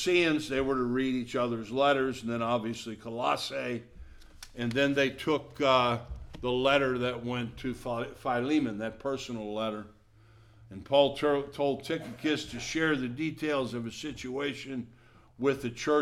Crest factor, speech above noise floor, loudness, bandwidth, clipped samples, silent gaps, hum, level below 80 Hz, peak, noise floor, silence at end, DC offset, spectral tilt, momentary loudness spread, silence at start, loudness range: 20 dB; 28 dB; -30 LUFS; 15 kHz; under 0.1%; none; none; -54 dBFS; -10 dBFS; -58 dBFS; 0 s; under 0.1%; -5 dB/octave; 12 LU; 0 s; 4 LU